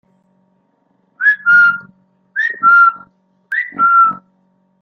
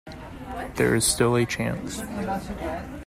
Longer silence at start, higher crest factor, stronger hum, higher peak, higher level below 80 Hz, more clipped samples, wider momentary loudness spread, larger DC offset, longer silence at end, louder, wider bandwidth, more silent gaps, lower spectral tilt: first, 1.2 s vs 0.05 s; about the same, 14 dB vs 18 dB; neither; first, -2 dBFS vs -8 dBFS; second, -68 dBFS vs -44 dBFS; neither; about the same, 14 LU vs 15 LU; neither; first, 0.65 s vs 0 s; first, -11 LUFS vs -25 LUFS; second, 6 kHz vs 16 kHz; neither; about the same, -3.5 dB/octave vs -4 dB/octave